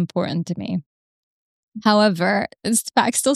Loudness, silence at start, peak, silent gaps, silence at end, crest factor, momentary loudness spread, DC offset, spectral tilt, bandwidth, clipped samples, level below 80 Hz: -20 LUFS; 0 s; -2 dBFS; 0.86-1.72 s; 0 s; 20 dB; 11 LU; under 0.1%; -4 dB/octave; 14 kHz; under 0.1%; -64 dBFS